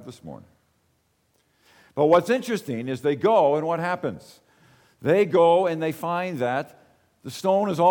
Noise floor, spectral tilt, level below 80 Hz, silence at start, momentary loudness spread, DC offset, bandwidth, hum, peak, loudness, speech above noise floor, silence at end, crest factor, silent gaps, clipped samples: -68 dBFS; -6.5 dB/octave; -68 dBFS; 0 s; 21 LU; under 0.1%; 19 kHz; none; -8 dBFS; -23 LUFS; 46 dB; 0 s; 16 dB; none; under 0.1%